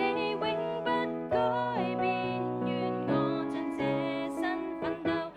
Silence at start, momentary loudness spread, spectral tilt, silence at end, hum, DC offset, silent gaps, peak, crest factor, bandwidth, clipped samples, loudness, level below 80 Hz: 0 s; 4 LU; -7 dB/octave; 0 s; none; under 0.1%; none; -18 dBFS; 14 dB; 12 kHz; under 0.1%; -31 LUFS; -62 dBFS